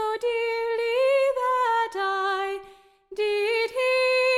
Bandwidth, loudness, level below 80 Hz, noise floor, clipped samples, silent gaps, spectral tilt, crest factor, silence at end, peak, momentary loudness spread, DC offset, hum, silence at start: 14 kHz; -24 LUFS; -64 dBFS; -51 dBFS; under 0.1%; none; -1 dB/octave; 10 dB; 0 s; -14 dBFS; 8 LU; under 0.1%; none; 0 s